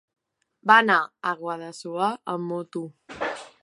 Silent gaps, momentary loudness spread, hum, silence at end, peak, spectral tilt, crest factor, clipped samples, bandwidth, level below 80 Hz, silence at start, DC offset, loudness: none; 17 LU; none; 0.15 s; -2 dBFS; -4.5 dB/octave; 24 dB; under 0.1%; 11.5 kHz; -70 dBFS; 0.65 s; under 0.1%; -24 LUFS